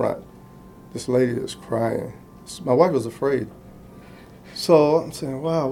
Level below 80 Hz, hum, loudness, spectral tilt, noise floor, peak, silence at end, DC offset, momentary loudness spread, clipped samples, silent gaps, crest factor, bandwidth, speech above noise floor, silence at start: -54 dBFS; none; -22 LUFS; -6 dB/octave; -45 dBFS; -2 dBFS; 0 s; under 0.1%; 19 LU; under 0.1%; none; 20 dB; 16.5 kHz; 23 dB; 0 s